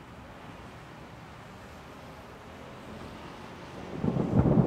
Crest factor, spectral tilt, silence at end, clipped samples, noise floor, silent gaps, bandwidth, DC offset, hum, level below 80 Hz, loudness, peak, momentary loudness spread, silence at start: 24 dB; -8.5 dB/octave; 0 s; under 0.1%; -47 dBFS; none; 14 kHz; under 0.1%; none; -48 dBFS; -33 LUFS; -10 dBFS; 19 LU; 0 s